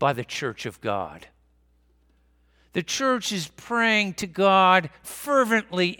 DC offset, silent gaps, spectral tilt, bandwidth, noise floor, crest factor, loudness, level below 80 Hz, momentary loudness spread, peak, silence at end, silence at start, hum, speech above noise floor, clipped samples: under 0.1%; none; -4 dB/octave; 19 kHz; -62 dBFS; 22 dB; -23 LUFS; -62 dBFS; 14 LU; -2 dBFS; 0.05 s; 0 s; 60 Hz at -55 dBFS; 39 dB; under 0.1%